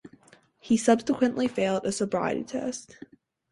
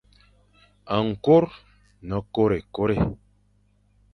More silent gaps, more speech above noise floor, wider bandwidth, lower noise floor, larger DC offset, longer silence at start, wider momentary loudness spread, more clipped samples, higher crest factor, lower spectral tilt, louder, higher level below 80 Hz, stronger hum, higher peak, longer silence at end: neither; second, 32 dB vs 41 dB; first, 11.5 kHz vs 6.2 kHz; second, -58 dBFS vs -63 dBFS; neither; second, 0.65 s vs 0.85 s; second, 10 LU vs 13 LU; neither; about the same, 20 dB vs 20 dB; second, -5 dB/octave vs -9 dB/octave; second, -26 LUFS vs -23 LUFS; second, -64 dBFS vs -46 dBFS; second, none vs 50 Hz at -45 dBFS; second, -8 dBFS vs -4 dBFS; second, 0.65 s vs 1 s